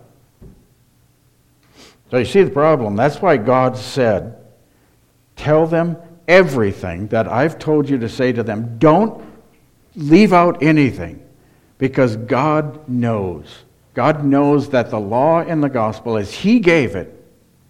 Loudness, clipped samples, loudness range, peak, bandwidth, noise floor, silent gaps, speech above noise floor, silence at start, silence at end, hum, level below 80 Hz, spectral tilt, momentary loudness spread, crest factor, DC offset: -16 LUFS; under 0.1%; 3 LU; 0 dBFS; 13.5 kHz; -56 dBFS; none; 41 dB; 0.4 s; 0.6 s; none; -48 dBFS; -7.5 dB/octave; 11 LU; 16 dB; under 0.1%